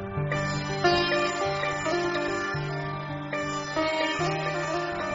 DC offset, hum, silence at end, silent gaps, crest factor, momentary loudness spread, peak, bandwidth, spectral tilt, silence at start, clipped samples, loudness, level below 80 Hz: under 0.1%; none; 0 s; none; 18 dB; 7 LU; -10 dBFS; 7.6 kHz; -3.5 dB/octave; 0 s; under 0.1%; -27 LUFS; -52 dBFS